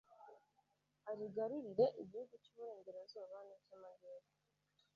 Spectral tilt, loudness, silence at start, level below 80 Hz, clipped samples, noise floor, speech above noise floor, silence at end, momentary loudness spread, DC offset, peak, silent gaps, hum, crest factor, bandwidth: -6 dB/octave; -44 LUFS; 0.1 s; -88 dBFS; under 0.1%; -82 dBFS; 37 dB; 0.75 s; 23 LU; under 0.1%; -24 dBFS; none; none; 24 dB; 6.8 kHz